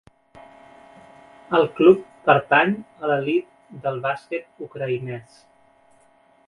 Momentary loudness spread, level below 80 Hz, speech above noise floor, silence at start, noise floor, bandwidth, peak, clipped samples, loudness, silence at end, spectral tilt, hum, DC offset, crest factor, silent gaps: 16 LU; -64 dBFS; 36 dB; 1.5 s; -57 dBFS; 10 kHz; 0 dBFS; under 0.1%; -21 LUFS; 1.25 s; -7.5 dB/octave; none; under 0.1%; 22 dB; none